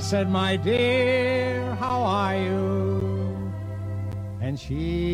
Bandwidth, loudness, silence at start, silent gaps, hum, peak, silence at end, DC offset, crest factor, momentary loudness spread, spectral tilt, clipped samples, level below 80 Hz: 11.5 kHz; -25 LUFS; 0 s; none; none; -10 dBFS; 0 s; under 0.1%; 14 dB; 10 LU; -6.5 dB/octave; under 0.1%; -44 dBFS